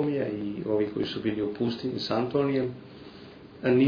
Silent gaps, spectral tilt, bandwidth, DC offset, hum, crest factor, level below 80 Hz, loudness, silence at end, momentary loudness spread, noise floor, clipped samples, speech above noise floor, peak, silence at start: none; -8 dB/octave; 5.4 kHz; under 0.1%; none; 16 dB; -62 dBFS; -29 LUFS; 0 s; 20 LU; -47 dBFS; under 0.1%; 20 dB; -12 dBFS; 0 s